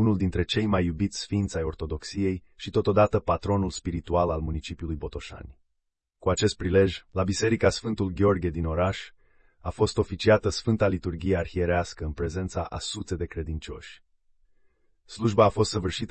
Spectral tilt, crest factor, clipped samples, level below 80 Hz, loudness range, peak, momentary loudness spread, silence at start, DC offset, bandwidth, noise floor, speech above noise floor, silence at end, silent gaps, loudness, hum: -6 dB/octave; 20 dB; under 0.1%; -44 dBFS; 5 LU; -8 dBFS; 13 LU; 0 s; under 0.1%; 8.8 kHz; -79 dBFS; 53 dB; 0 s; none; -27 LUFS; none